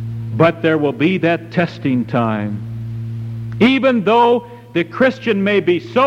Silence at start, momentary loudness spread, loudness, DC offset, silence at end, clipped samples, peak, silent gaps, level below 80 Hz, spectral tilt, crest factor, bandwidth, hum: 0 s; 13 LU; -16 LUFS; under 0.1%; 0 s; under 0.1%; -2 dBFS; none; -50 dBFS; -8 dB/octave; 14 dB; 9.2 kHz; none